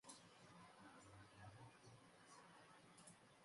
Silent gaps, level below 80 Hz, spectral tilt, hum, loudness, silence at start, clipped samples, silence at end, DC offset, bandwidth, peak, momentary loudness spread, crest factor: none; -86 dBFS; -3.5 dB/octave; none; -65 LUFS; 0.05 s; under 0.1%; 0 s; under 0.1%; 11.5 kHz; -46 dBFS; 4 LU; 18 dB